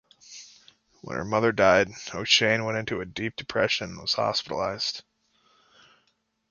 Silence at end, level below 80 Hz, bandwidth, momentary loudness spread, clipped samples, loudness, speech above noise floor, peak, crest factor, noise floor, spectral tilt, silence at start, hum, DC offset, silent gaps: 1.5 s; -58 dBFS; 7.4 kHz; 18 LU; under 0.1%; -25 LUFS; 46 dB; -4 dBFS; 24 dB; -72 dBFS; -3.5 dB/octave; 0.3 s; none; under 0.1%; none